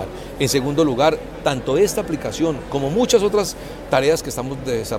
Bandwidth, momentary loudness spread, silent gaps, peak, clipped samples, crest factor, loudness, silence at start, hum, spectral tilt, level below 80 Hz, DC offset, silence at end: 16.5 kHz; 9 LU; none; -2 dBFS; under 0.1%; 18 dB; -20 LUFS; 0 s; none; -4.5 dB/octave; -40 dBFS; under 0.1%; 0 s